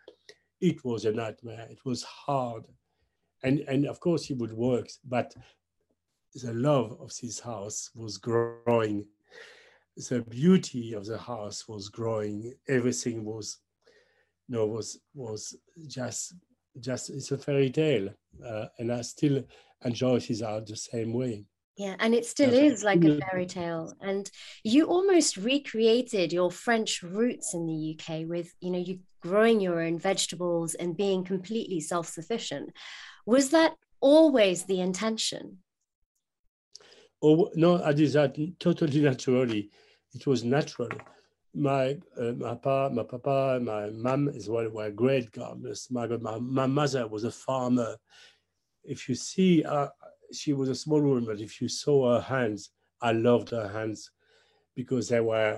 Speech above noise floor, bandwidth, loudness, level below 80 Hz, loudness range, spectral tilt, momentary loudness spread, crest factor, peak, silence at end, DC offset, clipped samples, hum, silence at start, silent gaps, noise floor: 51 dB; 12.5 kHz; -28 LUFS; -70 dBFS; 7 LU; -5.5 dB/octave; 15 LU; 20 dB; -8 dBFS; 0 s; under 0.1%; under 0.1%; none; 0.6 s; 21.64-21.74 s, 35.95-36.15 s, 36.39-36.71 s; -79 dBFS